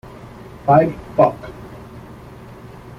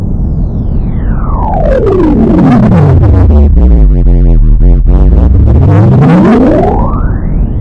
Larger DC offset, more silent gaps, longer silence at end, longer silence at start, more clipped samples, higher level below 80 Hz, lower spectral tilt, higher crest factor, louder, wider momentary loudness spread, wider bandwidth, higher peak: neither; neither; about the same, 0.1 s vs 0 s; first, 0.25 s vs 0 s; second, under 0.1% vs 1%; second, -46 dBFS vs -8 dBFS; second, -9 dB/octave vs -10.5 dB/octave; first, 18 dB vs 4 dB; second, -17 LUFS vs -7 LUFS; first, 24 LU vs 9 LU; first, 13.5 kHz vs 4.4 kHz; about the same, -2 dBFS vs 0 dBFS